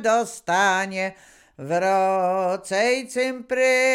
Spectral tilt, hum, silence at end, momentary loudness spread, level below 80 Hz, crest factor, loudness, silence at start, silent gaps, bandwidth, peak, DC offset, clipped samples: -3.5 dB/octave; none; 0 s; 7 LU; -66 dBFS; 14 dB; -22 LUFS; 0 s; none; 16 kHz; -8 dBFS; under 0.1%; under 0.1%